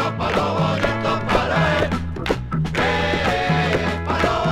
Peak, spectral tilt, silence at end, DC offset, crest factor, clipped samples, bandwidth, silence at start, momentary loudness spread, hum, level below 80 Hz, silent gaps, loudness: -4 dBFS; -6 dB/octave; 0 s; under 0.1%; 16 dB; under 0.1%; 13.5 kHz; 0 s; 5 LU; none; -34 dBFS; none; -20 LUFS